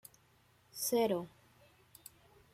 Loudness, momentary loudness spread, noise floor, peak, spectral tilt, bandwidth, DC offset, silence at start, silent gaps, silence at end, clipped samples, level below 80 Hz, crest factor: -35 LUFS; 24 LU; -69 dBFS; -22 dBFS; -3.5 dB/octave; 16.5 kHz; under 0.1%; 0.75 s; none; 1.25 s; under 0.1%; -78 dBFS; 18 dB